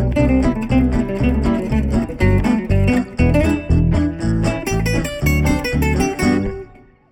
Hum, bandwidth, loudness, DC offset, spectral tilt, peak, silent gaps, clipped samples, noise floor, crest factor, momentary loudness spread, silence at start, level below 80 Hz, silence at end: none; 19 kHz; -17 LUFS; under 0.1%; -7 dB/octave; -2 dBFS; none; under 0.1%; -41 dBFS; 14 dB; 4 LU; 0 s; -22 dBFS; 0.45 s